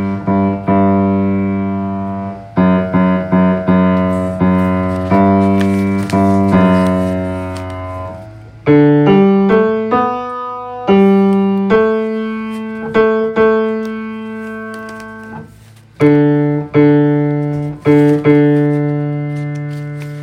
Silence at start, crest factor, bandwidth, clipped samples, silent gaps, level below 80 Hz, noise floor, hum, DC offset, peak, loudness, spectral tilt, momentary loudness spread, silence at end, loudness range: 0 s; 12 dB; 10 kHz; under 0.1%; none; -48 dBFS; -40 dBFS; none; under 0.1%; 0 dBFS; -13 LUFS; -9 dB/octave; 14 LU; 0 s; 5 LU